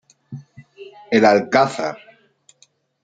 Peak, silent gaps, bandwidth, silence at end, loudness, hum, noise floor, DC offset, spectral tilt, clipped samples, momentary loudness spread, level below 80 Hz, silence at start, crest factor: -2 dBFS; none; 9.2 kHz; 1.05 s; -17 LUFS; none; -58 dBFS; under 0.1%; -5.5 dB/octave; under 0.1%; 24 LU; -66 dBFS; 0.3 s; 20 dB